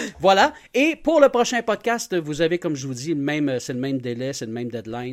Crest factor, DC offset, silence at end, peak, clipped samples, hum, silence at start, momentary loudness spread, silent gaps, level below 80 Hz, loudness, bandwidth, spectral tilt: 20 dB; under 0.1%; 0 s; -2 dBFS; under 0.1%; none; 0 s; 12 LU; none; -54 dBFS; -22 LUFS; 16 kHz; -4.5 dB/octave